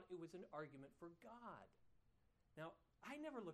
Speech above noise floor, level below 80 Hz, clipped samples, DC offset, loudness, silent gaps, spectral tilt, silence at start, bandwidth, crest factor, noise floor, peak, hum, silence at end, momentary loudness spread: 24 dB; -84 dBFS; under 0.1%; under 0.1%; -58 LUFS; none; -6 dB/octave; 0 s; 13 kHz; 20 dB; -80 dBFS; -38 dBFS; none; 0 s; 9 LU